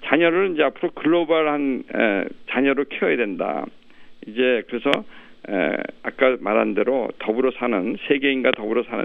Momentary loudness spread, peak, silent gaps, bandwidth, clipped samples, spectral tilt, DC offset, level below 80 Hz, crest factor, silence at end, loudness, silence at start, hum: 7 LU; 0 dBFS; none; 6.4 kHz; under 0.1%; -7 dB/octave; under 0.1%; -60 dBFS; 20 dB; 0 s; -21 LUFS; 0 s; none